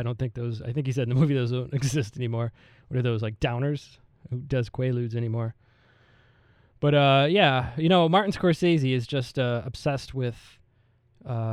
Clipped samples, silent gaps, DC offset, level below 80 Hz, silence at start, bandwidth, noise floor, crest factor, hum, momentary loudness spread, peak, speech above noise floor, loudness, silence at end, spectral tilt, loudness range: under 0.1%; none; under 0.1%; -52 dBFS; 0 s; 12 kHz; -64 dBFS; 18 dB; none; 13 LU; -8 dBFS; 39 dB; -25 LUFS; 0 s; -6.5 dB/octave; 8 LU